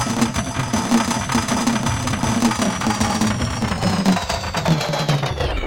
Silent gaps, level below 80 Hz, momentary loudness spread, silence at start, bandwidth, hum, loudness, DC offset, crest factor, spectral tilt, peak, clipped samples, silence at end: none; -34 dBFS; 3 LU; 0 s; 17 kHz; none; -20 LUFS; 0.2%; 14 dB; -4.5 dB/octave; -4 dBFS; under 0.1%; 0 s